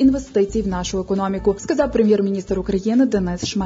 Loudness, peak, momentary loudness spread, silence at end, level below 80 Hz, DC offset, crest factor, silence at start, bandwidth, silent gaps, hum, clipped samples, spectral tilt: -20 LUFS; -6 dBFS; 6 LU; 0 s; -38 dBFS; under 0.1%; 14 dB; 0 s; 7.8 kHz; none; none; under 0.1%; -6 dB/octave